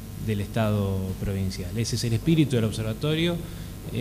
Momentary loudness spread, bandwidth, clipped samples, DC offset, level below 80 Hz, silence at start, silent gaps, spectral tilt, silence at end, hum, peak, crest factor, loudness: 9 LU; 15.5 kHz; under 0.1%; under 0.1%; -42 dBFS; 0 s; none; -6 dB/octave; 0 s; 50 Hz at -40 dBFS; -8 dBFS; 16 dB; -26 LUFS